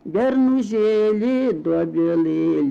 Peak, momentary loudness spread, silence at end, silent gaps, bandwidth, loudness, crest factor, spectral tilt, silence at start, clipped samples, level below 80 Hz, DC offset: -12 dBFS; 3 LU; 0 s; none; 7.6 kHz; -19 LUFS; 8 dB; -8 dB/octave; 0.05 s; under 0.1%; -58 dBFS; under 0.1%